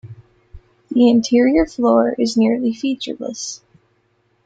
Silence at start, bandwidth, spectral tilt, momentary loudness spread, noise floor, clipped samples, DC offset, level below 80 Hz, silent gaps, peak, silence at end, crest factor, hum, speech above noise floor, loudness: 0.05 s; 7.8 kHz; -5 dB/octave; 13 LU; -62 dBFS; under 0.1%; under 0.1%; -46 dBFS; none; -2 dBFS; 0.9 s; 16 dB; none; 47 dB; -17 LUFS